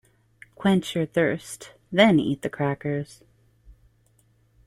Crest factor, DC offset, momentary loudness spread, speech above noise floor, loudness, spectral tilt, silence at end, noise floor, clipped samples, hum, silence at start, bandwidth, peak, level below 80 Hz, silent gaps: 22 dB; under 0.1%; 16 LU; 40 dB; -24 LUFS; -6 dB/octave; 0.95 s; -63 dBFS; under 0.1%; none; 0.6 s; 15 kHz; -4 dBFS; -58 dBFS; none